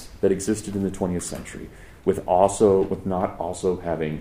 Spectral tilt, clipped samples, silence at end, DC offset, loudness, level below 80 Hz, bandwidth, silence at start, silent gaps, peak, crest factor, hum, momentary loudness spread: -6 dB/octave; under 0.1%; 0 s; under 0.1%; -23 LUFS; -46 dBFS; 15.5 kHz; 0 s; none; -2 dBFS; 20 dB; none; 14 LU